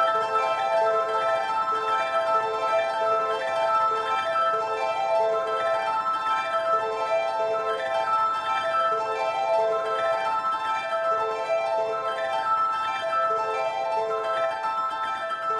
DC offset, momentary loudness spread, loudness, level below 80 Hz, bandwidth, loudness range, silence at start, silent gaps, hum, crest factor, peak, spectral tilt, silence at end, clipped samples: under 0.1%; 3 LU; -25 LUFS; -70 dBFS; 11.5 kHz; 2 LU; 0 s; none; none; 12 dB; -12 dBFS; -2.5 dB/octave; 0 s; under 0.1%